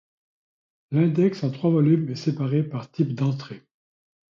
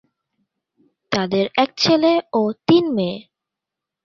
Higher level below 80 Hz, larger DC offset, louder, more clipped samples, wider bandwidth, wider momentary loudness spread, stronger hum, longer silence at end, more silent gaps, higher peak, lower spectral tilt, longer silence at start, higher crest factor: second, -66 dBFS vs -60 dBFS; neither; second, -23 LUFS vs -18 LUFS; neither; about the same, 7.4 kHz vs 7.4 kHz; first, 11 LU vs 8 LU; neither; about the same, 0.75 s vs 0.85 s; neither; second, -8 dBFS vs -2 dBFS; first, -9 dB/octave vs -5.5 dB/octave; second, 0.9 s vs 1.1 s; about the same, 16 dB vs 18 dB